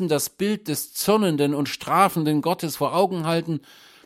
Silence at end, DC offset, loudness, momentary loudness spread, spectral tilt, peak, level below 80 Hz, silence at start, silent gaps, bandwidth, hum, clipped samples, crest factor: 0.45 s; under 0.1%; -23 LUFS; 7 LU; -5 dB/octave; -4 dBFS; -64 dBFS; 0 s; none; 16.5 kHz; none; under 0.1%; 18 dB